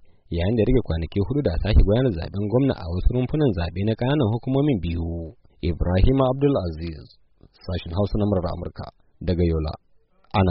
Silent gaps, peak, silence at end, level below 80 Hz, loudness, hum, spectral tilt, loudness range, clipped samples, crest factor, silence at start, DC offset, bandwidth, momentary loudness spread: none; -6 dBFS; 0 s; -28 dBFS; -23 LUFS; none; -7.5 dB/octave; 5 LU; under 0.1%; 16 dB; 0.3 s; under 0.1%; 5.6 kHz; 13 LU